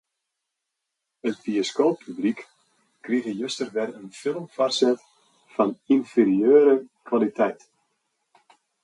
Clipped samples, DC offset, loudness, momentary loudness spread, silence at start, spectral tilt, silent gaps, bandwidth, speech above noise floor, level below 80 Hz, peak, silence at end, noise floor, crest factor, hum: under 0.1%; under 0.1%; -23 LUFS; 14 LU; 1.25 s; -5 dB/octave; none; 11 kHz; 60 dB; -74 dBFS; -6 dBFS; 1.3 s; -82 dBFS; 18 dB; none